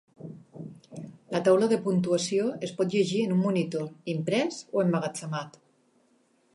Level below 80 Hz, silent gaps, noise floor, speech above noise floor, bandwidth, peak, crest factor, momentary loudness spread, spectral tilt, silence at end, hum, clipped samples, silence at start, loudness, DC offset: -74 dBFS; none; -66 dBFS; 40 dB; 11.5 kHz; -10 dBFS; 18 dB; 21 LU; -6 dB/octave; 1.05 s; none; under 0.1%; 0.2 s; -27 LUFS; under 0.1%